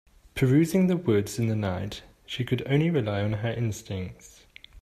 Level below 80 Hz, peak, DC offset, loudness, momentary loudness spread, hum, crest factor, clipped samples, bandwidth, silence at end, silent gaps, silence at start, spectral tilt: -54 dBFS; -10 dBFS; under 0.1%; -26 LUFS; 15 LU; none; 16 dB; under 0.1%; 15 kHz; 0 s; none; 0.35 s; -7 dB/octave